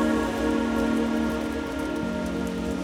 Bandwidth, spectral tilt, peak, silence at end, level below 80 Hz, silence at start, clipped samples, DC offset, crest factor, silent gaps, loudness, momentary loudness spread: 16.5 kHz; -6 dB/octave; -12 dBFS; 0 s; -40 dBFS; 0 s; under 0.1%; under 0.1%; 14 dB; none; -27 LUFS; 5 LU